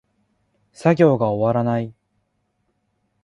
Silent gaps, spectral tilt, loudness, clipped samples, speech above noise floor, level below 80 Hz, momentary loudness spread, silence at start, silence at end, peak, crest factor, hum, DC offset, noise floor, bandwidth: none; -8.5 dB/octave; -19 LUFS; under 0.1%; 52 dB; -58 dBFS; 9 LU; 0.8 s; 1.3 s; -2 dBFS; 20 dB; none; under 0.1%; -70 dBFS; 11 kHz